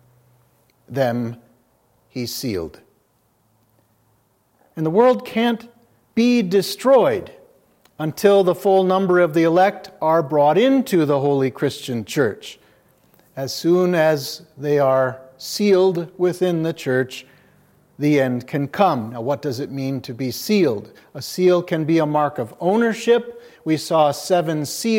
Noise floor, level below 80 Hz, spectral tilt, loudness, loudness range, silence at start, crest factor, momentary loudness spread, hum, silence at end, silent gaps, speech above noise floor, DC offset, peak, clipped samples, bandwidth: -63 dBFS; -66 dBFS; -6 dB/octave; -19 LUFS; 7 LU; 0.9 s; 18 dB; 13 LU; none; 0 s; none; 44 dB; under 0.1%; -2 dBFS; under 0.1%; 16.5 kHz